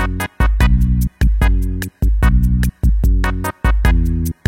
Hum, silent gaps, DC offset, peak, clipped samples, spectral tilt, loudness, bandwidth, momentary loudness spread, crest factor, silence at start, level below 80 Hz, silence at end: none; none; under 0.1%; -2 dBFS; under 0.1%; -6.5 dB/octave; -17 LUFS; 16 kHz; 5 LU; 12 dB; 0 s; -14 dBFS; 0.15 s